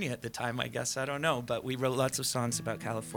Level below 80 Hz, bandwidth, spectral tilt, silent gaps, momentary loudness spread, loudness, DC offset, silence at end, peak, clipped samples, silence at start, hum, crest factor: -64 dBFS; 19.5 kHz; -4 dB/octave; none; 6 LU; -33 LUFS; under 0.1%; 0 s; -14 dBFS; under 0.1%; 0 s; none; 20 dB